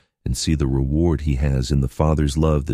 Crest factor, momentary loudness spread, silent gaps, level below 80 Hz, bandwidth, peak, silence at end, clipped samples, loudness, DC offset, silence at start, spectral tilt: 16 dB; 3 LU; none; -26 dBFS; 14 kHz; -4 dBFS; 0 s; under 0.1%; -20 LUFS; under 0.1%; 0.25 s; -6.5 dB/octave